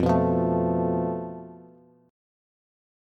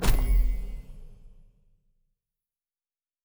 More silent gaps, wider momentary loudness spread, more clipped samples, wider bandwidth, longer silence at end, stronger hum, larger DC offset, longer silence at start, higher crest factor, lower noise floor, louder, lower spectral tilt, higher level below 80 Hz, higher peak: neither; second, 18 LU vs 24 LU; neither; second, 6.4 kHz vs over 20 kHz; second, 1.45 s vs 1.95 s; neither; neither; about the same, 0 s vs 0 s; about the same, 16 dB vs 20 dB; second, -53 dBFS vs under -90 dBFS; first, -25 LUFS vs -29 LUFS; first, -10 dB/octave vs -5 dB/octave; second, -52 dBFS vs -28 dBFS; about the same, -10 dBFS vs -8 dBFS